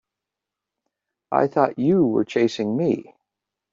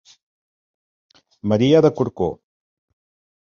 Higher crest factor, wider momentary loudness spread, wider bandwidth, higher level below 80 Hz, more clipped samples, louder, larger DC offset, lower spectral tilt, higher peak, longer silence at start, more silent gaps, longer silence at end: about the same, 20 dB vs 20 dB; second, 5 LU vs 11 LU; about the same, 7.6 kHz vs 7 kHz; second, -66 dBFS vs -52 dBFS; neither; second, -21 LUFS vs -18 LUFS; neither; about the same, -6.5 dB/octave vs -7.5 dB/octave; about the same, -4 dBFS vs -2 dBFS; second, 1.3 s vs 1.45 s; neither; second, 0.7 s vs 1.05 s